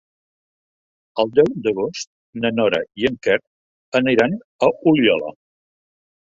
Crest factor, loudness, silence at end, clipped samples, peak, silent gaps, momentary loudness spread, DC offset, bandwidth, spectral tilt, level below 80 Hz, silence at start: 18 dB; -19 LUFS; 1 s; under 0.1%; -2 dBFS; 2.07-2.33 s, 3.47-3.92 s, 4.44-4.59 s; 10 LU; under 0.1%; 7.8 kHz; -5.5 dB/octave; -58 dBFS; 1.15 s